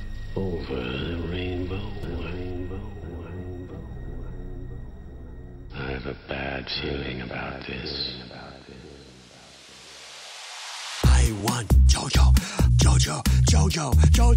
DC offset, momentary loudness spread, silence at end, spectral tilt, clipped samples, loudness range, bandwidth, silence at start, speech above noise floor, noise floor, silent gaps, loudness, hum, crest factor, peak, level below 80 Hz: under 0.1%; 23 LU; 0 s; -5 dB/octave; under 0.1%; 16 LU; 16 kHz; 0 s; 27 dB; -48 dBFS; none; -24 LUFS; none; 18 dB; -6 dBFS; -26 dBFS